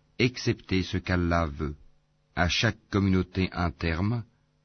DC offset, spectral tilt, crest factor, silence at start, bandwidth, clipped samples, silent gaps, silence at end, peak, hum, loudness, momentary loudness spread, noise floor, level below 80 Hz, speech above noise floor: under 0.1%; -6 dB/octave; 18 dB; 0.2 s; 6.6 kHz; under 0.1%; none; 0.4 s; -10 dBFS; none; -28 LUFS; 10 LU; -62 dBFS; -42 dBFS; 35 dB